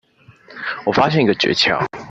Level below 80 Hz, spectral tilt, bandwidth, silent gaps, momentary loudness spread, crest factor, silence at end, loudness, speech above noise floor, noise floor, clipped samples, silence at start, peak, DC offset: -54 dBFS; -5 dB/octave; 8.2 kHz; none; 10 LU; 16 dB; 0 s; -17 LUFS; 31 dB; -47 dBFS; under 0.1%; 0.5 s; -2 dBFS; under 0.1%